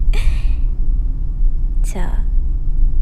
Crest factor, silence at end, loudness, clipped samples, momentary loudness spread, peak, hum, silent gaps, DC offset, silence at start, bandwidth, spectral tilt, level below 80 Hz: 10 dB; 0 s; -23 LUFS; under 0.1%; 3 LU; -2 dBFS; none; none; under 0.1%; 0 s; 8.8 kHz; -6 dB/octave; -14 dBFS